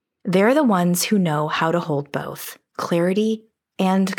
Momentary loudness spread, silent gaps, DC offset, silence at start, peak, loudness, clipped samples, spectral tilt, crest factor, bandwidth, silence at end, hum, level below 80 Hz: 13 LU; none; under 0.1%; 0.25 s; -6 dBFS; -20 LUFS; under 0.1%; -5.5 dB/octave; 14 dB; over 20 kHz; 0 s; none; -74 dBFS